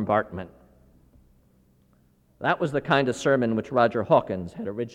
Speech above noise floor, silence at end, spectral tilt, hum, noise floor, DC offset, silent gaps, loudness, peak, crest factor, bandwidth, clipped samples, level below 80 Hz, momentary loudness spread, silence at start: 38 dB; 0 s; -6 dB/octave; none; -62 dBFS; under 0.1%; none; -24 LUFS; -6 dBFS; 20 dB; 11 kHz; under 0.1%; -58 dBFS; 12 LU; 0 s